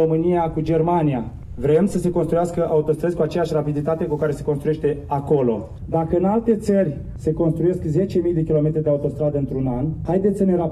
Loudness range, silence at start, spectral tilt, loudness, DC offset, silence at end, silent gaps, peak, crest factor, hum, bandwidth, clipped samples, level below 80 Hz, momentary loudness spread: 1 LU; 0 s; -9 dB/octave; -21 LUFS; under 0.1%; 0 s; none; -6 dBFS; 14 dB; none; 12.5 kHz; under 0.1%; -40 dBFS; 5 LU